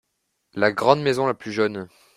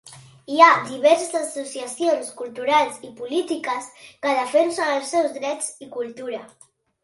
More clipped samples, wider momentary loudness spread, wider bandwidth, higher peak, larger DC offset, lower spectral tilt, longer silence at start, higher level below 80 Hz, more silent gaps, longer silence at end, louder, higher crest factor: neither; second, 12 LU vs 17 LU; first, 14.5 kHz vs 11.5 kHz; about the same, -2 dBFS vs 0 dBFS; neither; first, -5.5 dB/octave vs -2.5 dB/octave; first, 0.55 s vs 0.05 s; first, -62 dBFS vs -72 dBFS; neither; second, 0.3 s vs 0.6 s; about the same, -21 LUFS vs -21 LUFS; about the same, 22 dB vs 22 dB